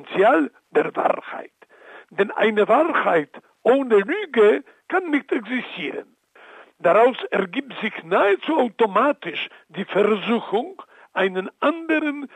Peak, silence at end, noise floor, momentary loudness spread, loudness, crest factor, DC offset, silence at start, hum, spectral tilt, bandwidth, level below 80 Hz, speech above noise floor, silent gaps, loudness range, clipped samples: -4 dBFS; 0.1 s; -47 dBFS; 12 LU; -21 LUFS; 16 dB; under 0.1%; 0 s; none; -6.5 dB/octave; 9.2 kHz; -80 dBFS; 27 dB; none; 3 LU; under 0.1%